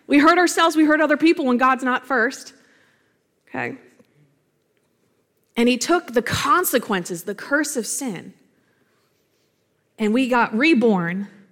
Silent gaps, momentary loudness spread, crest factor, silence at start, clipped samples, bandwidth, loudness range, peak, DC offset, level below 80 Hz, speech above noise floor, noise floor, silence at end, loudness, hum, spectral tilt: none; 14 LU; 18 dB; 0.1 s; under 0.1%; 17 kHz; 9 LU; -4 dBFS; under 0.1%; -58 dBFS; 48 dB; -67 dBFS; 0.25 s; -19 LUFS; none; -4 dB/octave